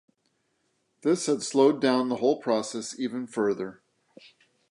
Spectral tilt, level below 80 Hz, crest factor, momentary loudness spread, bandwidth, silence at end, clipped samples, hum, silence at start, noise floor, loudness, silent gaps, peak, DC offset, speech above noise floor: -4.5 dB/octave; -78 dBFS; 18 dB; 11 LU; 11.5 kHz; 1 s; under 0.1%; none; 1.05 s; -74 dBFS; -26 LUFS; none; -8 dBFS; under 0.1%; 48 dB